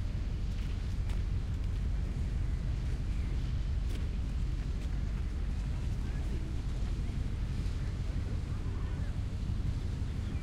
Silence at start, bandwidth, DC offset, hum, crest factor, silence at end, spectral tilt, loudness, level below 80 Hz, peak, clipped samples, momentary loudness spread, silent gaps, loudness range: 0 s; 10.5 kHz; under 0.1%; none; 10 dB; 0 s; -7 dB/octave; -37 LUFS; -34 dBFS; -22 dBFS; under 0.1%; 2 LU; none; 1 LU